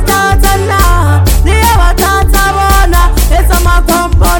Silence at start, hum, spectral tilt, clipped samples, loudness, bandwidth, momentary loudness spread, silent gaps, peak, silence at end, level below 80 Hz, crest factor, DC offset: 0 s; none; -4.5 dB/octave; 3%; -9 LUFS; over 20 kHz; 2 LU; none; 0 dBFS; 0 s; -10 dBFS; 6 dB; under 0.1%